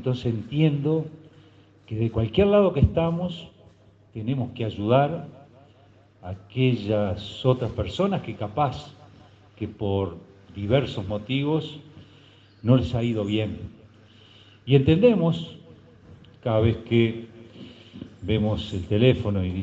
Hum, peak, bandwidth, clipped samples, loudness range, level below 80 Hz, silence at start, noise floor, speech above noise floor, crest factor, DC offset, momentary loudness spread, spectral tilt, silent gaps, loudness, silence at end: none; -6 dBFS; 7.6 kHz; under 0.1%; 5 LU; -48 dBFS; 0 s; -55 dBFS; 32 dB; 20 dB; under 0.1%; 21 LU; -8.5 dB/octave; none; -24 LUFS; 0 s